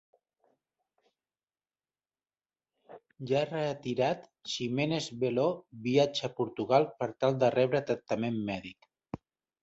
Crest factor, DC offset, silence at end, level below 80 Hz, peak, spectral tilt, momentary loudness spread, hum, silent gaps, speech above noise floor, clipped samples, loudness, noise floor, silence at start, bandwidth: 20 dB; under 0.1%; 0.45 s; -68 dBFS; -12 dBFS; -6 dB/octave; 12 LU; none; none; over 60 dB; under 0.1%; -31 LUFS; under -90 dBFS; 2.9 s; 8.2 kHz